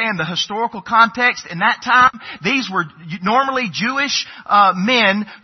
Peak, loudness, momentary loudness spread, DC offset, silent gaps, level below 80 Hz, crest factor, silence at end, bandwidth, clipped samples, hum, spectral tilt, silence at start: 0 dBFS; -16 LUFS; 9 LU; under 0.1%; none; -58 dBFS; 16 dB; 0.05 s; 6.4 kHz; under 0.1%; none; -3.5 dB/octave; 0 s